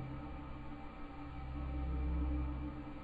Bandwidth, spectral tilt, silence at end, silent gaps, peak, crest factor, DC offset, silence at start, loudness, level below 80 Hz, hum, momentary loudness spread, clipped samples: 4.8 kHz; -9.5 dB/octave; 0 s; none; -28 dBFS; 14 dB; under 0.1%; 0 s; -43 LUFS; -42 dBFS; none; 11 LU; under 0.1%